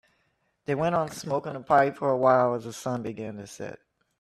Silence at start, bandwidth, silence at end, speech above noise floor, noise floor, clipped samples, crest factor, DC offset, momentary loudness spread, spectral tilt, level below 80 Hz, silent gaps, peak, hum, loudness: 0.7 s; 14 kHz; 0.45 s; 46 dB; -72 dBFS; under 0.1%; 20 dB; under 0.1%; 17 LU; -6 dB/octave; -64 dBFS; none; -8 dBFS; none; -26 LUFS